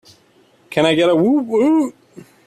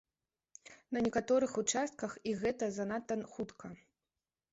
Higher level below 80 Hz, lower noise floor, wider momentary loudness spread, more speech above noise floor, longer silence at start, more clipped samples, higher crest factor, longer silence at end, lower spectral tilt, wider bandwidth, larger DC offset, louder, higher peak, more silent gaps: first, -62 dBFS vs -70 dBFS; second, -54 dBFS vs under -90 dBFS; second, 8 LU vs 20 LU; second, 39 dB vs over 54 dB; about the same, 0.7 s vs 0.7 s; neither; about the same, 16 dB vs 18 dB; second, 0.25 s vs 0.75 s; first, -6 dB/octave vs -4.5 dB/octave; first, 12.5 kHz vs 8 kHz; neither; first, -16 LUFS vs -36 LUFS; first, -2 dBFS vs -20 dBFS; neither